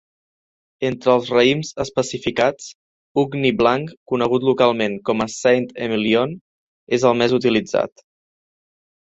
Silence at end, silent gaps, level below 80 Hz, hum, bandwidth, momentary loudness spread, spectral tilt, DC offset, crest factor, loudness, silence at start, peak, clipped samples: 1.15 s; 2.75-3.15 s, 3.97-4.06 s, 6.41-6.87 s; -54 dBFS; none; 8 kHz; 9 LU; -5 dB/octave; under 0.1%; 18 dB; -19 LUFS; 0.8 s; -2 dBFS; under 0.1%